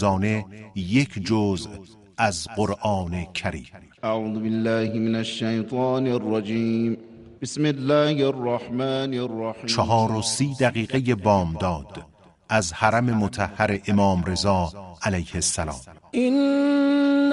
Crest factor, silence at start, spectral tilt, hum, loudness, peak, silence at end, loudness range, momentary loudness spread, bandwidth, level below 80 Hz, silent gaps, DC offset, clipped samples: 20 dB; 0 s; -5.5 dB/octave; none; -23 LUFS; -2 dBFS; 0 s; 3 LU; 11 LU; 11.5 kHz; -48 dBFS; none; under 0.1%; under 0.1%